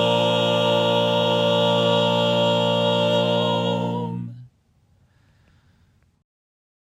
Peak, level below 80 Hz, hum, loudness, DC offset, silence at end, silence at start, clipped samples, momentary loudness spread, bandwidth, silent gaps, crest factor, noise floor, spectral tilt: -6 dBFS; -68 dBFS; none; -20 LUFS; under 0.1%; 2.4 s; 0 s; under 0.1%; 7 LU; 15.5 kHz; none; 16 dB; -61 dBFS; -5.5 dB/octave